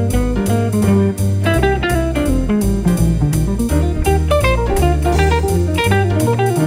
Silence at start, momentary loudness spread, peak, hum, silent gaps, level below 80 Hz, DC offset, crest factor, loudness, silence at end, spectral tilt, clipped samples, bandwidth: 0 s; 3 LU; -2 dBFS; none; none; -20 dBFS; under 0.1%; 12 dB; -15 LUFS; 0 s; -6.5 dB/octave; under 0.1%; 16 kHz